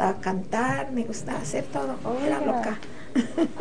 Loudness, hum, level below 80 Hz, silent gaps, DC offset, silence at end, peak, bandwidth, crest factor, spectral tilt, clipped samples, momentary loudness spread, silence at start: -28 LUFS; none; -52 dBFS; none; 2%; 0 s; -6 dBFS; 10 kHz; 20 dB; -5.5 dB/octave; under 0.1%; 6 LU; 0 s